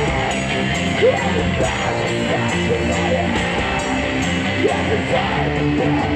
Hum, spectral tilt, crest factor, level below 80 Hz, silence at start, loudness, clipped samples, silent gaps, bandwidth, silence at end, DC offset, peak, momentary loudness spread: none; -5 dB/octave; 12 dB; -34 dBFS; 0 s; -18 LUFS; under 0.1%; none; 11 kHz; 0 s; under 0.1%; -6 dBFS; 3 LU